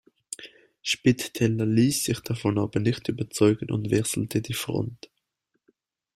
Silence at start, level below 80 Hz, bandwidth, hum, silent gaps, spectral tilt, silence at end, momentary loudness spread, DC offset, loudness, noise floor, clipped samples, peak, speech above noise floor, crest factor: 0.3 s; -56 dBFS; 16 kHz; none; none; -5 dB/octave; 1.2 s; 13 LU; under 0.1%; -25 LUFS; -78 dBFS; under 0.1%; -6 dBFS; 53 dB; 20 dB